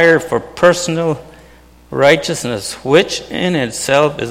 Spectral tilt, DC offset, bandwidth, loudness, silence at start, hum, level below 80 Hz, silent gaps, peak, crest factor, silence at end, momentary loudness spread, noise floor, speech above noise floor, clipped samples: -4 dB/octave; under 0.1%; 16 kHz; -14 LUFS; 0 s; none; -46 dBFS; none; 0 dBFS; 14 dB; 0 s; 9 LU; -43 dBFS; 29 dB; under 0.1%